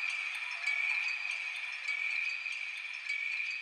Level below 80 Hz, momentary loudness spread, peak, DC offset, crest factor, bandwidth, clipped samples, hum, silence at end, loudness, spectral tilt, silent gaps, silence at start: under -90 dBFS; 6 LU; -22 dBFS; under 0.1%; 14 dB; 13.5 kHz; under 0.1%; none; 0 s; -34 LUFS; 6 dB/octave; none; 0 s